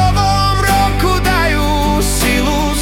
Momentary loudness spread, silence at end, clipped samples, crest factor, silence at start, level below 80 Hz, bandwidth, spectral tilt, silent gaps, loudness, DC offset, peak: 2 LU; 0 s; under 0.1%; 12 dB; 0 s; -18 dBFS; 18 kHz; -4.5 dB/octave; none; -13 LUFS; under 0.1%; -2 dBFS